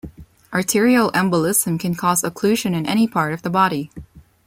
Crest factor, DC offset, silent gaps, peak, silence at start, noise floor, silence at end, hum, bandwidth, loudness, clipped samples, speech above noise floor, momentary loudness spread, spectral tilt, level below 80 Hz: 16 dB; under 0.1%; none; -4 dBFS; 0.05 s; -38 dBFS; 0.25 s; none; 16.5 kHz; -18 LUFS; under 0.1%; 20 dB; 7 LU; -4.5 dB/octave; -52 dBFS